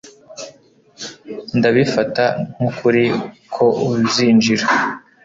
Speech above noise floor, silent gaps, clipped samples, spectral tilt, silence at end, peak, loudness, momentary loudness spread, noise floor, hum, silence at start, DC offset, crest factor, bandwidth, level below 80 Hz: 33 dB; none; under 0.1%; -5 dB/octave; 0.25 s; -2 dBFS; -16 LUFS; 20 LU; -49 dBFS; none; 0.05 s; under 0.1%; 16 dB; 7.8 kHz; -54 dBFS